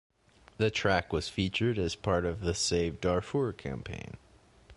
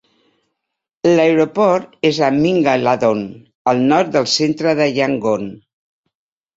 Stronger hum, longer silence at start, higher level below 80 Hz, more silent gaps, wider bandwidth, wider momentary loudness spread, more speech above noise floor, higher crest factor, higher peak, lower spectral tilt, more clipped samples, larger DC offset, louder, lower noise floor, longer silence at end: neither; second, 0.6 s vs 1.05 s; first, -48 dBFS vs -58 dBFS; second, none vs 3.55-3.65 s; first, 11.5 kHz vs 7.8 kHz; first, 11 LU vs 7 LU; second, 27 dB vs 64 dB; about the same, 20 dB vs 16 dB; second, -12 dBFS vs -2 dBFS; about the same, -4.5 dB/octave vs -5 dB/octave; neither; neither; second, -31 LUFS vs -15 LUFS; second, -58 dBFS vs -79 dBFS; second, 0.05 s vs 1 s